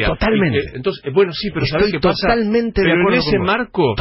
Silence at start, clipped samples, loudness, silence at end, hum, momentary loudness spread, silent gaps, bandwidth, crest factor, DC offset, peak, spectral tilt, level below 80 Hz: 0 s; under 0.1%; -16 LUFS; 0 s; none; 5 LU; none; 5.8 kHz; 12 dB; under 0.1%; -4 dBFS; -9 dB/octave; -32 dBFS